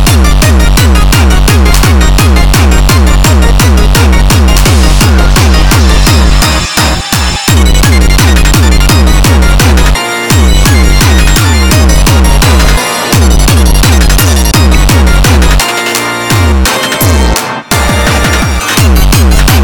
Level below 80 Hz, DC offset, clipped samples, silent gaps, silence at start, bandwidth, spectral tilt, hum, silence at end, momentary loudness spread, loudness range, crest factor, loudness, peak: -6 dBFS; 4%; 1%; none; 0 s; over 20 kHz; -4.5 dB/octave; none; 0 s; 3 LU; 2 LU; 4 dB; -6 LUFS; 0 dBFS